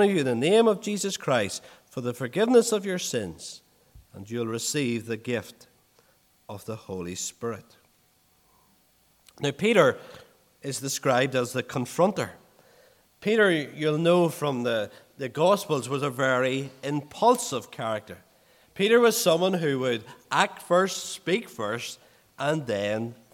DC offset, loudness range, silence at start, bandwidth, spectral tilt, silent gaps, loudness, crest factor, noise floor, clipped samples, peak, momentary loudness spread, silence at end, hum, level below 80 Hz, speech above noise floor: under 0.1%; 9 LU; 0 s; 17.5 kHz; -4.5 dB/octave; none; -26 LUFS; 22 dB; -64 dBFS; under 0.1%; -4 dBFS; 16 LU; 0.2 s; none; -70 dBFS; 39 dB